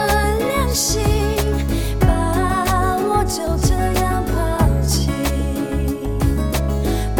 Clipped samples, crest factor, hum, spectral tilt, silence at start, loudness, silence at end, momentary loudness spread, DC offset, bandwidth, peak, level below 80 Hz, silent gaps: under 0.1%; 14 dB; none; -5 dB/octave; 0 s; -19 LUFS; 0 s; 4 LU; 0.4%; 17.5 kHz; -4 dBFS; -22 dBFS; none